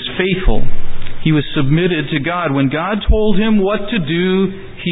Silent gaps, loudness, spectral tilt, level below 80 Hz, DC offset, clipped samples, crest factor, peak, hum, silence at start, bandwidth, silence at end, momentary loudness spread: none; -16 LUFS; -12 dB/octave; -24 dBFS; under 0.1%; under 0.1%; 12 dB; 0 dBFS; none; 0 s; 4 kHz; 0 s; 8 LU